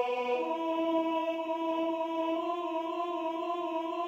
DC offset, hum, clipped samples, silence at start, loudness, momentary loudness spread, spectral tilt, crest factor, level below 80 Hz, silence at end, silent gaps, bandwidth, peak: under 0.1%; none; under 0.1%; 0 s; -32 LUFS; 4 LU; -4.5 dB/octave; 14 dB; -82 dBFS; 0 s; none; 15.5 kHz; -18 dBFS